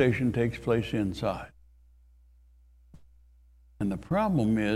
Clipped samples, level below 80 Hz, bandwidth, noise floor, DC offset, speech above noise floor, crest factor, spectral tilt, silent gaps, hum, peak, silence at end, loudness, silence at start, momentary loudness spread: under 0.1%; -50 dBFS; 14 kHz; -58 dBFS; under 0.1%; 31 dB; 20 dB; -7.5 dB/octave; none; 60 Hz at -60 dBFS; -10 dBFS; 0 s; -29 LUFS; 0 s; 8 LU